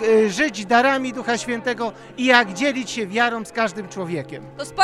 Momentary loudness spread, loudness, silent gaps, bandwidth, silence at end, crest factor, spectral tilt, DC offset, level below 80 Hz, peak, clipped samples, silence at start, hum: 13 LU; -20 LUFS; none; 12.5 kHz; 0 s; 20 dB; -3.5 dB/octave; under 0.1%; -58 dBFS; 0 dBFS; under 0.1%; 0 s; none